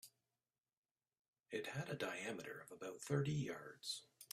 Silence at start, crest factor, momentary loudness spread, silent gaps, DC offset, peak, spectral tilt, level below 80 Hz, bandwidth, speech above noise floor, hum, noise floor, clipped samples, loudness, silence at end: 0.05 s; 22 dB; 11 LU; 0.77-0.83 s, 0.91-0.95 s, 1.19-1.33 s; under 0.1%; -26 dBFS; -5 dB/octave; -80 dBFS; 15.5 kHz; over 45 dB; none; under -90 dBFS; under 0.1%; -46 LUFS; 0.1 s